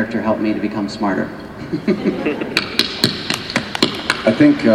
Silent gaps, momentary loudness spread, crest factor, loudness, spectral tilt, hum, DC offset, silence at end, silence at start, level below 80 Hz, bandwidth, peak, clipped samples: none; 9 LU; 18 dB; -18 LUFS; -4.5 dB/octave; none; under 0.1%; 0 s; 0 s; -48 dBFS; 18 kHz; 0 dBFS; under 0.1%